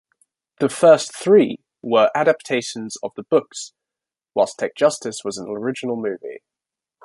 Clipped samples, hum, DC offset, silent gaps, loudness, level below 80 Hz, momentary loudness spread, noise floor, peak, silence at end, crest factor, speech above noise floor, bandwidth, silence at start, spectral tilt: under 0.1%; none; under 0.1%; none; -19 LUFS; -68 dBFS; 16 LU; -88 dBFS; -2 dBFS; 0.65 s; 18 dB; 69 dB; 11.5 kHz; 0.6 s; -4.5 dB/octave